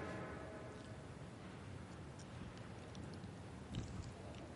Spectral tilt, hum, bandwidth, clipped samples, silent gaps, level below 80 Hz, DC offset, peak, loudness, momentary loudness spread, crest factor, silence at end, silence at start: -6 dB/octave; none; 11.5 kHz; under 0.1%; none; -62 dBFS; under 0.1%; -32 dBFS; -52 LUFS; 5 LU; 18 dB; 0 s; 0 s